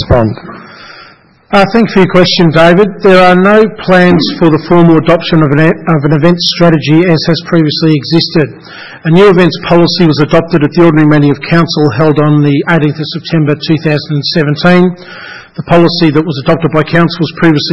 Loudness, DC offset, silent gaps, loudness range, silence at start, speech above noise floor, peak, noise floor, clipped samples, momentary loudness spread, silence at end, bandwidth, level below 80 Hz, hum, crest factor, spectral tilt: -8 LUFS; 2%; none; 4 LU; 0 s; 31 dB; 0 dBFS; -38 dBFS; 3%; 7 LU; 0 s; 8 kHz; -34 dBFS; none; 8 dB; -7.5 dB/octave